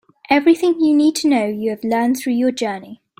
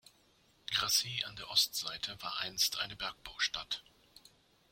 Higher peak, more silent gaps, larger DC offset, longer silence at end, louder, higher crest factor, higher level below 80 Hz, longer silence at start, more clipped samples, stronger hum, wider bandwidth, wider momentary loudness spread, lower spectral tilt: first, -2 dBFS vs -14 dBFS; neither; neither; second, 0.25 s vs 0.9 s; first, -17 LUFS vs -34 LUFS; second, 16 dB vs 24 dB; first, -62 dBFS vs -68 dBFS; second, 0.3 s vs 0.7 s; neither; neither; about the same, 16 kHz vs 16.5 kHz; about the same, 9 LU vs 11 LU; first, -4.5 dB/octave vs 0.5 dB/octave